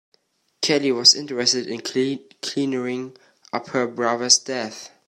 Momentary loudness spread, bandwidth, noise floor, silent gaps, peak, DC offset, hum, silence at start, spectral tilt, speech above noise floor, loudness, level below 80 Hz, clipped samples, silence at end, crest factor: 16 LU; 14.5 kHz; -65 dBFS; none; 0 dBFS; under 0.1%; none; 0.6 s; -2 dB/octave; 43 dB; -20 LUFS; -72 dBFS; under 0.1%; 0.2 s; 22 dB